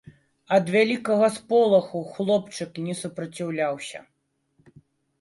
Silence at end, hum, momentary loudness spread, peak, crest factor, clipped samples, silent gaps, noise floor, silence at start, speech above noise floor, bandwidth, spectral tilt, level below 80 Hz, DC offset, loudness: 1.2 s; none; 14 LU; -6 dBFS; 18 dB; under 0.1%; none; -69 dBFS; 0.5 s; 46 dB; 11.5 kHz; -5.5 dB/octave; -70 dBFS; under 0.1%; -24 LUFS